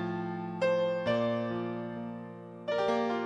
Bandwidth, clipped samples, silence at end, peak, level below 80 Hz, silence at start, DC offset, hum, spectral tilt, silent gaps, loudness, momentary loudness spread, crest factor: 9.8 kHz; under 0.1%; 0 s; -16 dBFS; -68 dBFS; 0 s; under 0.1%; none; -7 dB/octave; none; -32 LUFS; 12 LU; 16 dB